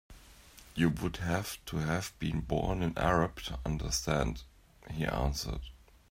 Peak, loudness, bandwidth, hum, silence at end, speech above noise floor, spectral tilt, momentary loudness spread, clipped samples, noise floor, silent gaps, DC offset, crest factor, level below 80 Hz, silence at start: -14 dBFS; -34 LUFS; 16 kHz; none; 0.35 s; 23 dB; -5 dB/octave; 13 LU; under 0.1%; -56 dBFS; none; under 0.1%; 20 dB; -44 dBFS; 0.1 s